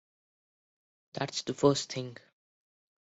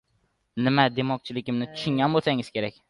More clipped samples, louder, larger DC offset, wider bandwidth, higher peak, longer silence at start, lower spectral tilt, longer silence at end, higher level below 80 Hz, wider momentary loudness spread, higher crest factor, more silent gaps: neither; second, -31 LUFS vs -25 LUFS; neither; second, 8 kHz vs 11.5 kHz; second, -12 dBFS vs -6 dBFS; first, 1.15 s vs 0.55 s; second, -4.5 dB/octave vs -7 dB/octave; first, 0.95 s vs 0.2 s; second, -70 dBFS vs -62 dBFS; first, 16 LU vs 9 LU; about the same, 24 dB vs 20 dB; neither